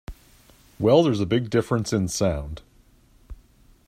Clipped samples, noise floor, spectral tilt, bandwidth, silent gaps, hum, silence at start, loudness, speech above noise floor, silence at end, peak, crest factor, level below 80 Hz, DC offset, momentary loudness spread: under 0.1%; -56 dBFS; -6 dB/octave; 15.5 kHz; none; none; 0.1 s; -22 LUFS; 35 dB; 0.55 s; -4 dBFS; 20 dB; -44 dBFS; under 0.1%; 19 LU